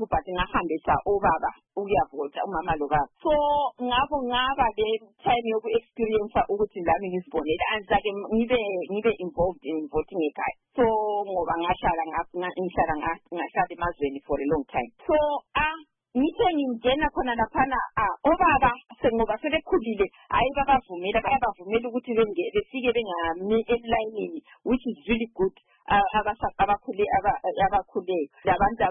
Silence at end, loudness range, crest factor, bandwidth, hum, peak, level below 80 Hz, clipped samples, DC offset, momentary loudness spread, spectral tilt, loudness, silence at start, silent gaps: 0 s; 3 LU; 16 dB; 3.7 kHz; none; -10 dBFS; -44 dBFS; under 0.1%; under 0.1%; 6 LU; -9.5 dB/octave; -26 LUFS; 0 s; none